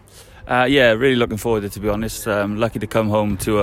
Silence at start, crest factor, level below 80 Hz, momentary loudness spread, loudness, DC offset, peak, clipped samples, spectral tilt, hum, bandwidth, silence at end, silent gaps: 0.15 s; 18 dB; -40 dBFS; 9 LU; -18 LUFS; under 0.1%; -2 dBFS; under 0.1%; -5 dB/octave; none; 16.5 kHz; 0 s; none